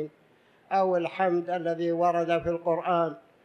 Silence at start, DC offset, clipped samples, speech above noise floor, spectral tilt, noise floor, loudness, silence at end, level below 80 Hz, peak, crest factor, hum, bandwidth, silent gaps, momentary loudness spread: 0 s; under 0.1%; under 0.1%; 35 dB; -7.5 dB/octave; -61 dBFS; -27 LUFS; 0.25 s; -62 dBFS; -12 dBFS; 16 dB; none; 6.6 kHz; none; 5 LU